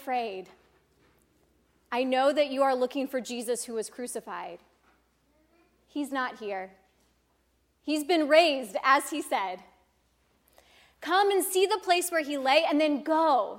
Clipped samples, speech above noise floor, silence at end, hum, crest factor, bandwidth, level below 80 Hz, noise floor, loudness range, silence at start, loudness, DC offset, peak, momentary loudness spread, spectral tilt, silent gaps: under 0.1%; 44 dB; 0 s; none; 20 dB; 17 kHz; -74 dBFS; -70 dBFS; 11 LU; 0 s; -27 LUFS; under 0.1%; -8 dBFS; 15 LU; -2 dB/octave; none